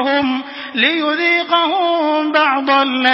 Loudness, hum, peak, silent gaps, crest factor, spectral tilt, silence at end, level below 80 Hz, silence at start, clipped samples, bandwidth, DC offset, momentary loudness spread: -15 LUFS; none; 0 dBFS; none; 16 dB; -5 dB/octave; 0 s; -62 dBFS; 0 s; under 0.1%; 8 kHz; under 0.1%; 5 LU